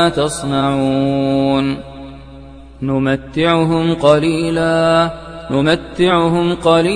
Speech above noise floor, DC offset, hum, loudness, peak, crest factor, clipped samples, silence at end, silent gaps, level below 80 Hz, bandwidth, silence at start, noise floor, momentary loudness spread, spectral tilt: 21 dB; under 0.1%; none; -15 LUFS; 0 dBFS; 14 dB; under 0.1%; 0 s; none; -40 dBFS; 10 kHz; 0 s; -35 dBFS; 8 LU; -6 dB/octave